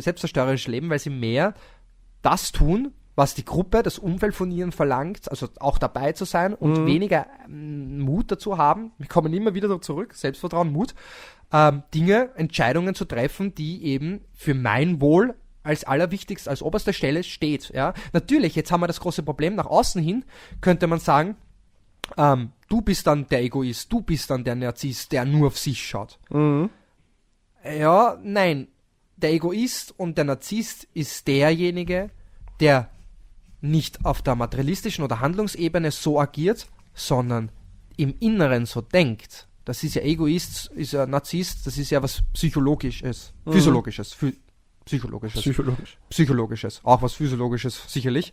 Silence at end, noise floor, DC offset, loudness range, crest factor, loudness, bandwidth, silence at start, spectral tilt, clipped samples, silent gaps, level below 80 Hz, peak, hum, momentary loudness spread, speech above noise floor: 0.05 s; -63 dBFS; under 0.1%; 2 LU; 22 dB; -23 LUFS; 16 kHz; 0 s; -6 dB/octave; under 0.1%; none; -38 dBFS; -2 dBFS; none; 11 LU; 41 dB